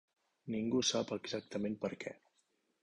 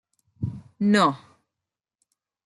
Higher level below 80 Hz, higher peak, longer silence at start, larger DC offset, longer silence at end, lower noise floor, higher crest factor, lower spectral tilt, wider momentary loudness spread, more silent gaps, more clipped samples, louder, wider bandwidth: second, -74 dBFS vs -62 dBFS; second, -20 dBFS vs -8 dBFS; about the same, 0.45 s vs 0.4 s; neither; second, 0.65 s vs 1.3 s; second, -79 dBFS vs -88 dBFS; about the same, 20 dB vs 20 dB; second, -4 dB/octave vs -6 dB/octave; about the same, 14 LU vs 15 LU; neither; neither; second, -38 LUFS vs -24 LUFS; about the same, 10.5 kHz vs 11.5 kHz